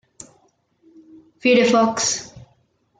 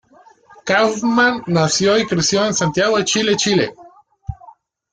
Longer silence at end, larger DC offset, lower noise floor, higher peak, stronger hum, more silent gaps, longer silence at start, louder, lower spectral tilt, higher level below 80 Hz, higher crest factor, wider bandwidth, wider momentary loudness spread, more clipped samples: first, 0.6 s vs 0.4 s; neither; first, -63 dBFS vs -48 dBFS; about the same, -4 dBFS vs -2 dBFS; neither; neither; first, 1.45 s vs 0.65 s; about the same, -18 LUFS vs -16 LUFS; about the same, -3 dB/octave vs -3.5 dB/octave; second, -64 dBFS vs -48 dBFS; about the same, 18 dB vs 16 dB; about the same, 9.6 kHz vs 10 kHz; second, 12 LU vs 18 LU; neither